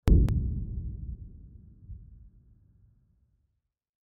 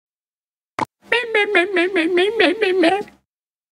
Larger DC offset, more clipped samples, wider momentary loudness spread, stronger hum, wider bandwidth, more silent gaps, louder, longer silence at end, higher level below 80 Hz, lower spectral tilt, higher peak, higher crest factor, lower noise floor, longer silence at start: neither; neither; first, 28 LU vs 12 LU; neither; second, 1.7 kHz vs 11 kHz; neither; second, -30 LUFS vs -17 LUFS; first, 1.9 s vs 0.7 s; first, -32 dBFS vs -62 dBFS; first, -11.5 dB/octave vs -3.5 dB/octave; second, -10 dBFS vs 0 dBFS; about the same, 22 dB vs 18 dB; second, -81 dBFS vs under -90 dBFS; second, 0.05 s vs 0.8 s